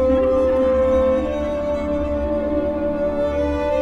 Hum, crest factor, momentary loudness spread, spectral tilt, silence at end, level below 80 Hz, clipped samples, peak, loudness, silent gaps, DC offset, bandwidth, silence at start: none; 12 dB; 5 LU; -8 dB/octave; 0 s; -32 dBFS; under 0.1%; -8 dBFS; -20 LUFS; none; under 0.1%; 7.6 kHz; 0 s